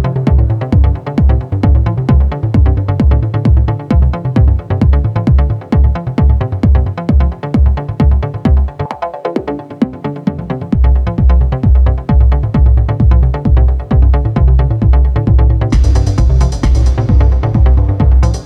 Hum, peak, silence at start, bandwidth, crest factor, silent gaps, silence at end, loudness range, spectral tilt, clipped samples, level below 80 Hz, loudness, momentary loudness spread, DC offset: none; 0 dBFS; 0 s; 6.2 kHz; 10 dB; none; 0 s; 4 LU; -9 dB/octave; under 0.1%; -12 dBFS; -12 LUFS; 6 LU; under 0.1%